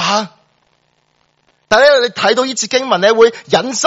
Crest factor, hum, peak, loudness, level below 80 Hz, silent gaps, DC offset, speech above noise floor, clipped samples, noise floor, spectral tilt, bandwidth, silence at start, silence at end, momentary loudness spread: 14 dB; none; 0 dBFS; -12 LUFS; -56 dBFS; none; under 0.1%; 48 dB; 0.1%; -60 dBFS; -2.5 dB/octave; 8 kHz; 0 s; 0 s; 7 LU